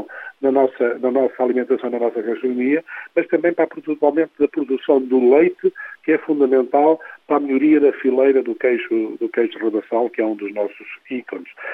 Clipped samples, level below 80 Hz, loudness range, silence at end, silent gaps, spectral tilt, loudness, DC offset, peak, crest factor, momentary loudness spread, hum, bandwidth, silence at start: under 0.1%; -68 dBFS; 3 LU; 0 s; none; -8.5 dB/octave; -19 LUFS; under 0.1%; -2 dBFS; 16 dB; 10 LU; none; 3.9 kHz; 0 s